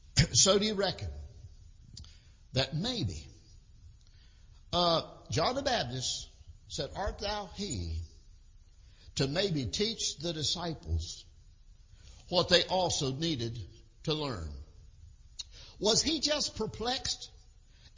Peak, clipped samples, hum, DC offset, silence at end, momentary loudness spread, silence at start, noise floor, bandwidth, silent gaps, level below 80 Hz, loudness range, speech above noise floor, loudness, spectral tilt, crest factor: -10 dBFS; under 0.1%; none; under 0.1%; 0.1 s; 20 LU; 0.05 s; -57 dBFS; 7.8 kHz; none; -48 dBFS; 6 LU; 25 dB; -31 LUFS; -3.5 dB/octave; 24 dB